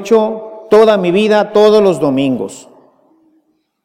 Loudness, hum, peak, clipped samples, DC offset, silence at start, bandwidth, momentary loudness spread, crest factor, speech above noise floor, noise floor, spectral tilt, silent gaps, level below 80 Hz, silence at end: -11 LUFS; none; 0 dBFS; under 0.1%; under 0.1%; 0 s; 12 kHz; 12 LU; 12 dB; 48 dB; -59 dBFS; -6 dB/octave; none; -56 dBFS; 1.25 s